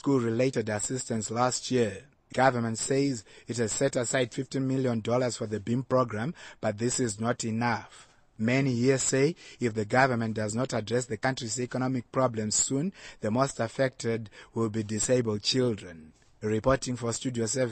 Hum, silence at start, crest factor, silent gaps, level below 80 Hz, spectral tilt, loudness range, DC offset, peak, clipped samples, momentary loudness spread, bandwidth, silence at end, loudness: none; 0.05 s; 20 dB; none; -58 dBFS; -4.5 dB/octave; 2 LU; under 0.1%; -8 dBFS; under 0.1%; 8 LU; 12.5 kHz; 0 s; -29 LUFS